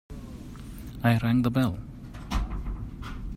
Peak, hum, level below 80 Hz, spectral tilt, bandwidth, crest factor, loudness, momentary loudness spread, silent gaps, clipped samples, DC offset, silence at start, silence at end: -8 dBFS; none; -38 dBFS; -7.5 dB/octave; 15.5 kHz; 20 dB; -28 LUFS; 19 LU; none; under 0.1%; under 0.1%; 0.1 s; 0 s